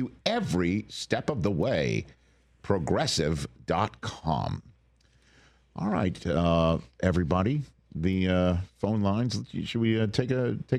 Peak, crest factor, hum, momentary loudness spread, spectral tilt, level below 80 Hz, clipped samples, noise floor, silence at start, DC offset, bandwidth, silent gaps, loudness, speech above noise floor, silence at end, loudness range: -10 dBFS; 18 dB; none; 8 LU; -6 dB/octave; -48 dBFS; under 0.1%; -63 dBFS; 0 s; under 0.1%; 12.5 kHz; none; -28 LUFS; 36 dB; 0 s; 4 LU